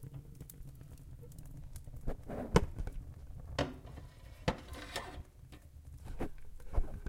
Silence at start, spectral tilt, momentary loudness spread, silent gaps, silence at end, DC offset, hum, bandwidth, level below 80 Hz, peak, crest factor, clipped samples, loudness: 0 s; -5.5 dB/octave; 19 LU; none; 0 s; under 0.1%; none; 16.5 kHz; -44 dBFS; -10 dBFS; 30 dB; under 0.1%; -42 LUFS